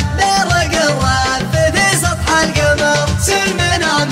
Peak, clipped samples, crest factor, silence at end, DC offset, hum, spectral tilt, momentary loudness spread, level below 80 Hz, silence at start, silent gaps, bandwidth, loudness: -2 dBFS; under 0.1%; 12 dB; 0 s; under 0.1%; none; -3.5 dB/octave; 2 LU; -28 dBFS; 0 s; none; 16 kHz; -13 LUFS